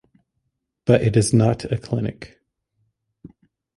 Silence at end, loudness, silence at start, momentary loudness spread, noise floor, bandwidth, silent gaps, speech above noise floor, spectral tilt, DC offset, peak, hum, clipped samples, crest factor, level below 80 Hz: 0.5 s; -20 LUFS; 0.85 s; 12 LU; -75 dBFS; 11.5 kHz; none; 57 dB; -6.5 dB/octave; under 0.1%; -2 dBFS; none; under 0.1%; 20 dB; -48 dBFS